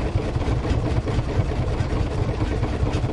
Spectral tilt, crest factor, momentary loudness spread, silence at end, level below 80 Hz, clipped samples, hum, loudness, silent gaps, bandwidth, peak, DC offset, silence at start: -7.5 dB/octave; 14 dB; 1 LU; 0 s; -28 dBFS; under 0.1%; none; -24 LUFS; none; 11 kHz; -8 dBFS; under 0.1%; 0 s